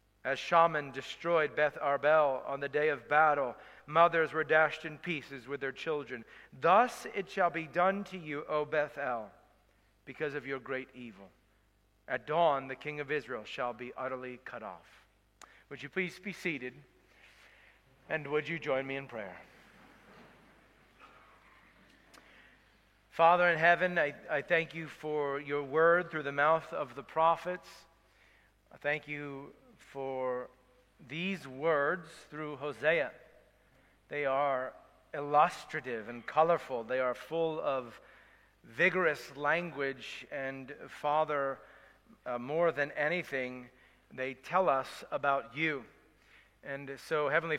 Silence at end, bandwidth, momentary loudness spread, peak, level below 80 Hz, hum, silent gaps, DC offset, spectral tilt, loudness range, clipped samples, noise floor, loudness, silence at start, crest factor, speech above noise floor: 0 s; 14.5 kHz; 17 LU; -10 dBFS; -72 dBFS; none; none; under 0.1%; -5.5 dB/octave; 10 LU; under 0.1%; -70 dBFS; -32 LUFS; 0.25 s; 22 dB; 37 dB